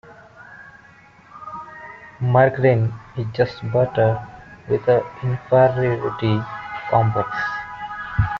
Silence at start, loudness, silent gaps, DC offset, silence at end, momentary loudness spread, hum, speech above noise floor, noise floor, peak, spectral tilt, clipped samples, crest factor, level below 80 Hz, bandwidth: 0.05 s; -20 LUFS; none; under 0.1%; 0 s; 21 LU; none; 30 dB; -48 dBFS; -4 dBFS; -6.5 dB/octave; under 0.1%; 18 dB; -44 dBFS; 6.4 kHz